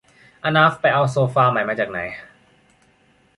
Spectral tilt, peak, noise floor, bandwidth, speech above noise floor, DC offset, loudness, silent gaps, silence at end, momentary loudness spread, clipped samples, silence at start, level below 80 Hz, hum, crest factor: -6.5 dB/octave; -2 dBFS; -58 dBFS; 11.5 kHz; 40 dB; under 0.1%; -18 LUFS; none; 1.15 s; 13 LU; under 0.1%; 0.45 s; -58 dBFS; none; 18 dB